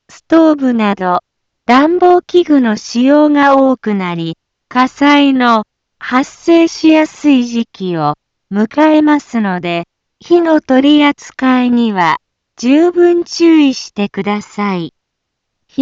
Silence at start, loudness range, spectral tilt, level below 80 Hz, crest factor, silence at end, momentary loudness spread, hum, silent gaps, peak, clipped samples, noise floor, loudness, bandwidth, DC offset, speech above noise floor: 0.3 s; 2 LU; -5.5 dB/octave; -56 dBFS; 12 dB; 0 s; 11 LU; none; none; 0 dBFS; under 0.1%; -73 dBFS; -11 LUFS; 7.8 kHz; under 0.1%; 63 dB